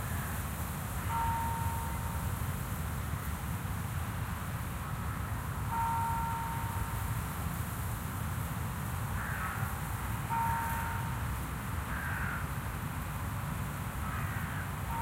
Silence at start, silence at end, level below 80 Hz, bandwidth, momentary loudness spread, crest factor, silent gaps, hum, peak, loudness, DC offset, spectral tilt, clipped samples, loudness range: 0 s; 0 s; -42 dBFS; 16 kHz; 5 LU; 16 dB; none; none; -18 dBFS; -36 LUFS; under 0.1%; -5 dB/octave; under 0.1%; 2 LU